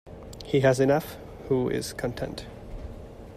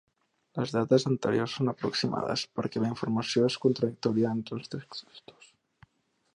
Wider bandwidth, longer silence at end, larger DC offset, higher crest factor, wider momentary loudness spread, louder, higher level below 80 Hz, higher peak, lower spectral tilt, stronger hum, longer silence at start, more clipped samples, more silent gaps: first, 15.5 kHz vs 11 kHz; second, 0 s vs 1.15 s; neither; about the same, 20 dB vs 20 dB; first, 20 LU vs 13 LU; first, -26 LUFS vs -29 LUFS; first, -46 dBFS vs -68 dBFS; about the same, -8 dBFS vs -10 dBFS; about the same, -6 dB/octave vs -6 dB/octave; neither; second, 0.05 s vs 0.55 s; neither; neither